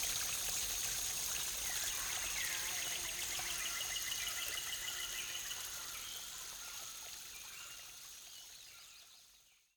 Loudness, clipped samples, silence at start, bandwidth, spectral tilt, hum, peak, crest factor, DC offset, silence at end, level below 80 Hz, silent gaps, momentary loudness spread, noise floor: -39 LUFS; under 0.1%; 0 s; 19 kHz; 1.5 dB/octave; none; -24 dBFS; 18 dB; under 0.1%; 0.25 s; -64 dBFS; none; 14 LU; -67 dBFS